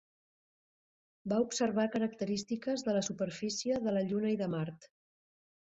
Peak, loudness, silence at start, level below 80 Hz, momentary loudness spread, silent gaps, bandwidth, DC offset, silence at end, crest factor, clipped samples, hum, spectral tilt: -20 dBFS; -34 LUFS; 1.25 s; -72 dBFS; 5 LU; none; 8 kHz; under 0.1%; 0.8 s; 16 dB; under 0.1%; none; -5.5 dB/octave